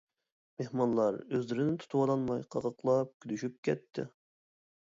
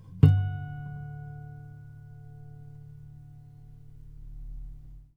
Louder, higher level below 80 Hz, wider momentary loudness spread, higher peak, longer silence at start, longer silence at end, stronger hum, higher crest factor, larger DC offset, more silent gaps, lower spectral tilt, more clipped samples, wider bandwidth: second, -33 LUFS vs -28 LUFS; second, -72 dBFS vs -46 dBFS; second, 12 LU vs 27 LU; second, -16 dBFS vs -4 dBFS; first, 0.6 s vs 0 s; first, 0.8 s vs 0.1 s; neither; second, 16 dB vs 28 dB; neither; first, 3.14-3.20 s, 3.58-3.63 s vs none; second, -7.5 dB/octave vs -10 dB/octave; neither; first, 7.8 kHz vs 3.9 kHz